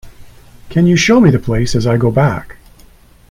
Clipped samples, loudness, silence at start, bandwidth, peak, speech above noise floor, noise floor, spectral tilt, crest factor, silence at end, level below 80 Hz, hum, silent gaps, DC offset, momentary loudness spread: under 0.1%; -12 LUFS; 0.05 s; 15 kHz; 0 dBFS; 32 dB; -43 dBFS; -6 dB/octave; 14 dB; 0.8 s; -32 dBFS; none; none; under 0.1%; 7 LU